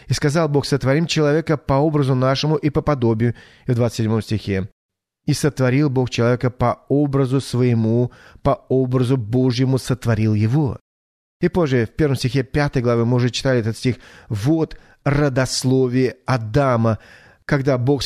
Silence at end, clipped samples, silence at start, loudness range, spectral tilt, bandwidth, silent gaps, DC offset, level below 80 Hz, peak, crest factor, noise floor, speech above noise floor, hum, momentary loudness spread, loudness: 0 s; under 0.1%; 0.05 s; 2 LU; -6.5 dB/octave; 13.5 kHz; 4.72-4.89 s, 10.81-11.40 s; under 0.1%; -42 dBFS; -4 dBFS; 14 dB; under -90 dBFS; over 72 dB; none; 6 LU; -19 LUFS